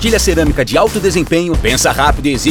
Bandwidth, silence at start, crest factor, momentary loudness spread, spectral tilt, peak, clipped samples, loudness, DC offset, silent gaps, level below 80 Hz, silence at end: 19.5 kHz; 0 s; 12 dB; 3 LU; -4 dB/octave; 0 dBFS; under 0.1%; -12 LUFS; under 0.1%; none; -22 dBFS; 0 s